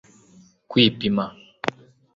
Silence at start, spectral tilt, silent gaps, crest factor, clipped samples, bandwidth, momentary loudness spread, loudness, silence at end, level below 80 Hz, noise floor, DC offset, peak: 0.7 s; -6 dB/octave; none; 24 dB; under 0.1%; 7.6 kHz; 12 LU; -22 LUFS; 0.45 s; -58 dBFS; -54 dBFS; under 0.1%; -2 dBFS